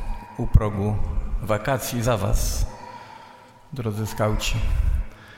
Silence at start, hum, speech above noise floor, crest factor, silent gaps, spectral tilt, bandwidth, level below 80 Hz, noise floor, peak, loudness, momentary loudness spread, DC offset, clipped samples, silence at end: 0 s; none; 25 dB; 22 dB; none; -5.5 dB/octave; 16.5 kHz; -26 dBFS; -47 dBFS; -2 dBFS; -25 LUFS; 16 LU; under 0.1%; under 0.1%; 0 s